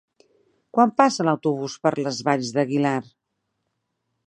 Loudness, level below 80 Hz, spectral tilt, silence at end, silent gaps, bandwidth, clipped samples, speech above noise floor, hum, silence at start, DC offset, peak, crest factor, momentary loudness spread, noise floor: -22 LUFS; -74 dBFS; -5.5 dB/octave; 1.25 s; none; 10 kHz; under 0.1%; 56 dB; none; 0.75 s; under 0.1%; 0 dBFS; 22 dB; 7 LU; -77 dBFS